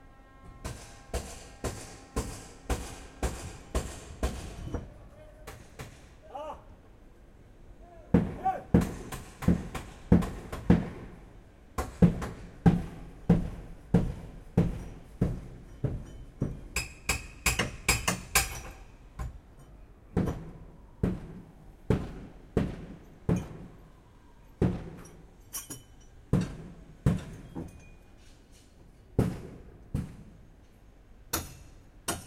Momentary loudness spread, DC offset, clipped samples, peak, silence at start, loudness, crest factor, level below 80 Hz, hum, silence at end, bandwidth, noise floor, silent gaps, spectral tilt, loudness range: 21 LU; under 0.1%; under 0.1%; -6 dBFS; 0 s; -32 LUFS; 26 dB; -42 dBFS; none; 0 s; 16.5 kHz; -55 dBFS; none; -5.5 dB/octave; 10 LU